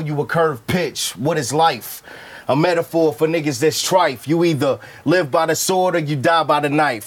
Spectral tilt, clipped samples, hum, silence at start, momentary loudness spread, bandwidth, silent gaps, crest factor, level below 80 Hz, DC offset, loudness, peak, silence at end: -4.5 dB/octave; under 0.1%; none; 0 s; 6 LU; 19.5 kHz; none; 16 dB; -58 dBFS; under 0.1%; -18 LUFS; -2 dBFS; 0 s